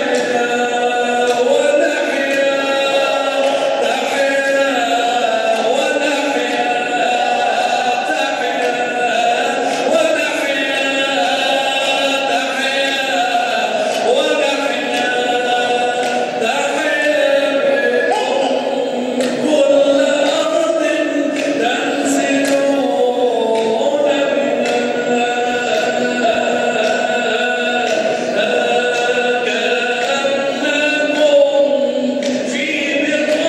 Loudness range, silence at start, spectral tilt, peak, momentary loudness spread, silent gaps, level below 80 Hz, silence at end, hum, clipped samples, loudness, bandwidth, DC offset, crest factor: 1 LU; 0 s; -2.5 dB/octave; -2 dBFS; 3 LU; none; -68 dBFS; 0 s; none; under 0.1%; -15 LUFS; 13.5 kHz; under 0.1%; 14 dB